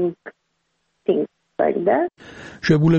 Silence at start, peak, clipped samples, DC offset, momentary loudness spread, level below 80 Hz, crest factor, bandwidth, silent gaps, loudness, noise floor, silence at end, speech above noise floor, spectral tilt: 0 s; -4 dBFS; under 0.1%; under 0.1%; 21 LU; -54 dBFS; 18 dB; 7.2 kHz; none; -22 LUFS; -71 dBFS; 0 s; 53 dB; -8 dB/octave